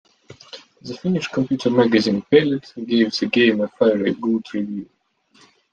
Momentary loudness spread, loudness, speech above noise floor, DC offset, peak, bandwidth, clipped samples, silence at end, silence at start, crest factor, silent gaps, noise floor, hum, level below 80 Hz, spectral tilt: 17 LU; -19 LUFS; 38 dB; under 0.1%; -2 dBFS; 9 kHz; under 0.1%; 0.9 s; 0.3 s; 18 dB; none; -57 dBFS; none; -62 dBFS; -6 dB/octave